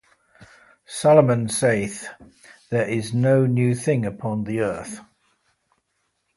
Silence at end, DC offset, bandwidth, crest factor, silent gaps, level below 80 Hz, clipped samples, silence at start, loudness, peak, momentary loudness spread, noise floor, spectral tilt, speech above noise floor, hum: 1.35 s; under 0.1%; 11.5 kHz; 20 dB; none; -58 dBFS; under 0.1%; 0.4 s; -21 LUFS; -2 dBFS; 19 LU; -73 dBFS; -6 dB/octave; 52 dB; none